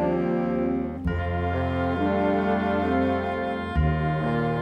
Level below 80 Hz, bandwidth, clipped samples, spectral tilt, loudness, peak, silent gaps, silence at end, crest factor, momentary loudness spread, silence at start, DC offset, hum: -36 dBFS; 8.2 kHz; under 0.1%; -9 dB/octave; -25 LUFS; -10 dBFS; none; 0 s; 14 dB; 4 LU; 0 s; under 0.1%; none